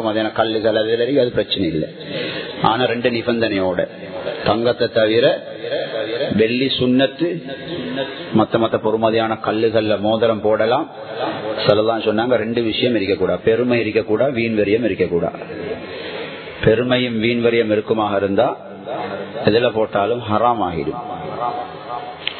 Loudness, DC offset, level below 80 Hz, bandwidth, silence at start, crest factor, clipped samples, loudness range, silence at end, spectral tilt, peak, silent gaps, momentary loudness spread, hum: -18 LUFS; under 0.1%; -48 dBFS; 4.6 kHz; 0 s; 18 dB; under 0.1%; 2 LU; 0 s; -9.5 dB/octave; 0 dBFS; none; 11 LU; none